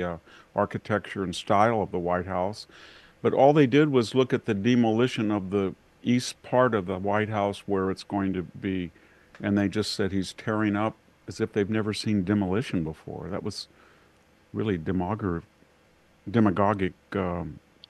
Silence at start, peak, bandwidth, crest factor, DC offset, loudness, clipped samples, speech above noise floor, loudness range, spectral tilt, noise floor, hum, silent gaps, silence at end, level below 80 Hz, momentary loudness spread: 0 s; -6 dBFS; 12.5 kHz; 20 dB; under 0.1%; -26 LUFS; under 0.1%; 35 dB; 7 LU; -6.5 dB/octave; -61 dBFS; none; none; 0.3 s; -58 dBFS; 12 LU